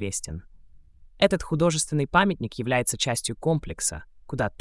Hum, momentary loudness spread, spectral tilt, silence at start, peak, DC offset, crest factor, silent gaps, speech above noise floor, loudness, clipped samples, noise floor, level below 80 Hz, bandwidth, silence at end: none; 11 LU; -4 dB/octave; 0 s; -6 dBFS; under 0.1%; 20 dB; none; 25 dB; -25 LUFS; under 0.1%; -50 dBFS; -46 dBFS; 12 kHz; 0.1 s